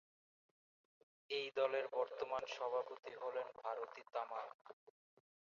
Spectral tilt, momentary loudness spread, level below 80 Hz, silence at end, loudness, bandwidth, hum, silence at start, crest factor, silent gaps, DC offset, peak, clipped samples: 0.5 dB/octave; 11 LU; -90 dBFS; 0.7 s; -44 LUFS; 7.2 kHz; none; 1.3 s; 22 dB; 4.54-4.65 s, 4.73-4.87 s; under 0.1%; -24 dBFS; under 0.1%